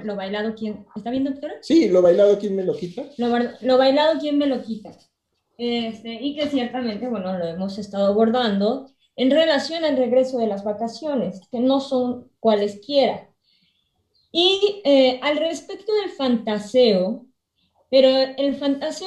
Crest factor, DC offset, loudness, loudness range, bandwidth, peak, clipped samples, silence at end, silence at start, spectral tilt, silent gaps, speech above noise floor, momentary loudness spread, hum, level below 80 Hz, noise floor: 16 dB; under 0.1%; -21 LUFS; 4 LU; 9.4 kHz; -4 dBFS; under 0.1%; 0 s; 0 s; -5.5 dB/octave; none; 48 dB; 12 LU; none; -64 dBFS; -68 dBFS